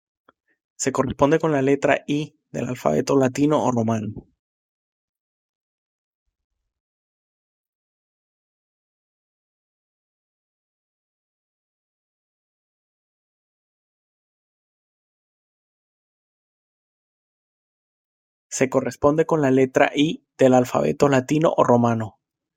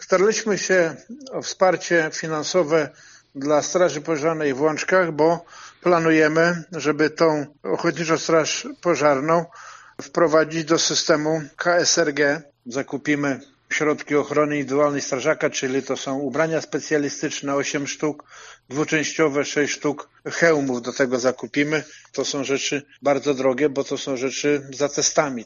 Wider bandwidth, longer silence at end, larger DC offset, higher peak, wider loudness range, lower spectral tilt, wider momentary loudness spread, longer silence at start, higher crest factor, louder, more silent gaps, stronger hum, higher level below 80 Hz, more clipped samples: first, 16 kHz vs 7.4 kHz; first, 0.5 s vs 0 s; neither; about the same, -2 dBFS vs -2 dBFS; first, 11 LU vs 3 LU; first, -6 dB/octave vs -3.5 dB/octave; about the same, 10 LU vs 9 LU; first, 0.8 s vs 0 s; about the same, 22 dB vs 20 dB; about the same, -20 LUFS vs -21 LUFS; first, 4.39-6.26 s, 6.44-6.50 s, 6.80-18.50 s vs none; neither; first, -58 dBFS vs -68 dBFS; neither